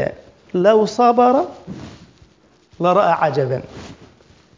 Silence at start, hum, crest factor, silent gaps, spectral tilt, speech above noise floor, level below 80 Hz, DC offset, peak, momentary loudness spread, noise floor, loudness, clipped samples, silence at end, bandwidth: 0 s; none; 16 dB; none; -6.5 dB/octave; 38 dB; -52 dBFS; under 0.1%; -2 dBFS; 21 LU; -53 dBFS; -16 LUFS; under 0.1%; 0.65 s; 7.6 kHz